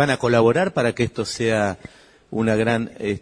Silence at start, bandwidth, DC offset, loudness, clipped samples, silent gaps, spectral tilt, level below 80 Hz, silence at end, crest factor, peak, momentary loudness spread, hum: 0 s; 10.5 kHz; under 0.1%; -21 LUFS; under 0.1%; none; -5.5 dB/octave; -52 dBFS; 0 s; 18 dB; -2 dBFS; 9 LU; none